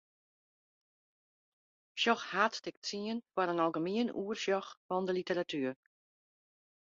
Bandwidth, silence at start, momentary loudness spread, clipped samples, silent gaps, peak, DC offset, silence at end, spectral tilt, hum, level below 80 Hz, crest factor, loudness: 7.6 kHz; 1.95 s; 8 LU; under 0.1%; 2.77-2.82 s, 4.77-4.89 s; -14 dBFS; under 0.1%; 1.1 s; -2.5 dB/octave; none; -82 dBFS; 24 dB; -35 LUFS